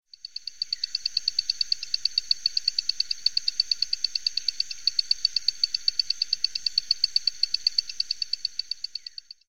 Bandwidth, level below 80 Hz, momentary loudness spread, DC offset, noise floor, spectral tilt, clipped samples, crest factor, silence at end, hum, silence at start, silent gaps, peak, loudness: 16.5 kHz; -64 dBFS; 8 LU; 0.9%; -44 dBFS; 3.5 dB/octave; under 0.1%; 20 dB; 0 s; none; 0 s; none; -8 dBFS; -25 LUFS